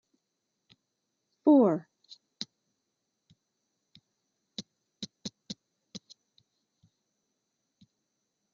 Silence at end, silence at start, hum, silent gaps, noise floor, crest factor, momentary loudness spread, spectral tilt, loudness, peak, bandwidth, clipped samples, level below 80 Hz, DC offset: 3 s; 1.45 s; none; none; -83 dBFS; 22 dB; 26 LU; -6 dB/octave; -28 LUFS; -12 dBFS; 7.4 kHz; under 0.1%; -84 dBFS; under 0.1%